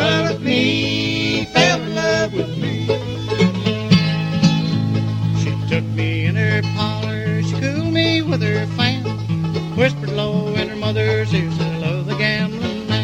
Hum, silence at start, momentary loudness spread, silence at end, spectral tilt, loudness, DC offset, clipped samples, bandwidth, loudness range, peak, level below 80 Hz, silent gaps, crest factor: none; 0 s; 6 LU; 0 s; -6 dB/octave; -18 LUFS; under 0.1%; under 0.1%; 9.2 kHz; 2 LU; 0 dBFS; -46 dBFS; none; 18 dB